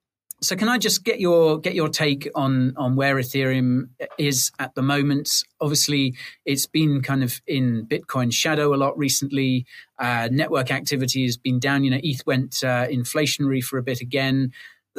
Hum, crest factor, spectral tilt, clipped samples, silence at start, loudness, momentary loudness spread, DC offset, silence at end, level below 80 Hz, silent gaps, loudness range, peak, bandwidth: none; 14 dB; -4.5 dB/octave; under 0.1%; 0.4 s; -22 LUFS; 6 LU; under 0.1%; 0.3 s; -62 dBFS; none; 2 LU; -8 dBFS; 15.5 kHz